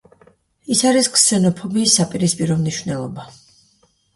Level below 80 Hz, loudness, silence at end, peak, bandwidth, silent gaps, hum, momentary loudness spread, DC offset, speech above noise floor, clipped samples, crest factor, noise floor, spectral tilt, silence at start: -56 dBFS; -16 LUFS; 0.9 s; 0 dBFS; 11.5 kHz; none; none; 13 LU; under 0.1%; 42 dB; under 0.1%; 18 dB; -60 dBFS; -3.5 dB/octave; 0.7 s